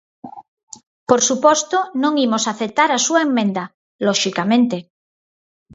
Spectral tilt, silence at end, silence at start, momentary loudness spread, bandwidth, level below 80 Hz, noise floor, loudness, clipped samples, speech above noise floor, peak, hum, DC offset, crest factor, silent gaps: -3 dB/octave; 0.9 s; 0.25 s; 8 LU; 8 kHz; -66 dBFS; under -90 dBFS; -17 LUFS; under 0.1%; over 73 dB; 0 dBFS; none; under 0.1%; 18 dB; 0.48-0.57 s, 0.63-0.67 s, 0.87-1.06 s, 3.74-3.99 s